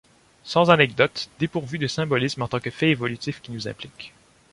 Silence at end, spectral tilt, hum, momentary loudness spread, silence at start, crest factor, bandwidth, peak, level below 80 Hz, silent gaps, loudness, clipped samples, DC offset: 0.45 s; -5.5 dB/octave; none; 17 LU; 0.45 s; 22 dB; 11.5 kHz; -2 dBFS; -58 dBFS; none; -23 LUFS; under 0.1%; under 0.1%